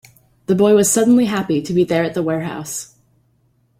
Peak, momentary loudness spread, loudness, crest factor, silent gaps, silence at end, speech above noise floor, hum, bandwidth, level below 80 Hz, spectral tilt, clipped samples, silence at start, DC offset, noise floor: -2 dBFS; 14 LU; -16 LUFS; 14 dB; none; 0.95 s; 44 dB; none; 16.5 kHz; -56 dBFS; -5 dB/octave; under 0.1%; 0.5 s; under 0.1%; -60 dBFS